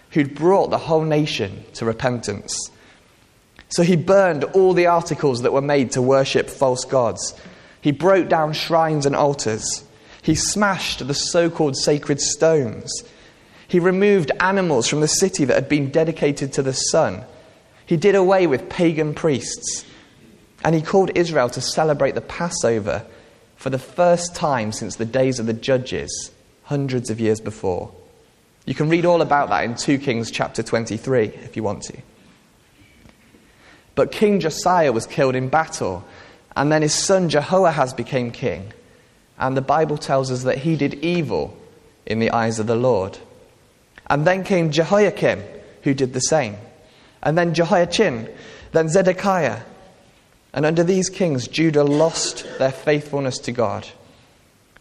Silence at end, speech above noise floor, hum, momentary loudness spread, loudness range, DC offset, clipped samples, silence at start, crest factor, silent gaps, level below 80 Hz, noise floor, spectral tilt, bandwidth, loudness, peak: 0.9 s; 36 dB; none; 10 LU; 4 LU; under 0.1%; under 0.1%; 0.1 s; 18 dB; none; -52 dBFS; -55 dBFS; -4.5 dB/octave; 13 kHz; -19 LUFS; -2 dBFS